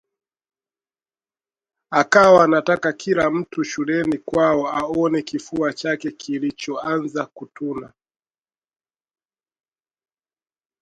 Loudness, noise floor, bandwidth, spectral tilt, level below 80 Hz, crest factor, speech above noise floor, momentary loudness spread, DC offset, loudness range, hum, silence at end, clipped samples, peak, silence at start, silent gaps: -19 LUFS; under -90 dBFS; 11 kHz; -5.5 dB/octave; -58 dBFS; 22 dB; over 71 dB; 15 LU; under 0.1%; 13 LU; none; 2.95 s; under 0.1%; 0 dBFS; 1.9 s; none